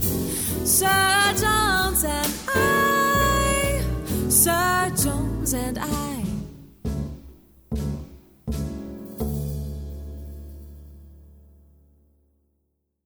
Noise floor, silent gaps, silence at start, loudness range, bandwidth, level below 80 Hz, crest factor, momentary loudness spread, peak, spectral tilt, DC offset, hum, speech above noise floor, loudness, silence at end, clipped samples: -74 dBFS; none; 0 s; 15 LU; over 20 kHz; -34 dBFS; 20 dB; 19 LU; -4 dBFS; -3 dB/octave; under 0.1%; none; 53 dB; -22 LUFS; 1.75 s; under 0.1%